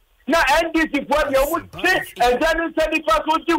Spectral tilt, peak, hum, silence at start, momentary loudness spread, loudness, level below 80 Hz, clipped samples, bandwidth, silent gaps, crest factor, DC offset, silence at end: -3 dB/octave; -8 dBFS; none; 0.25 s; 4 LU; -19 LUFS; -38 dBFS; under 0.1%; 16 kHz; none; 12 dB; under 0.1%; 0 s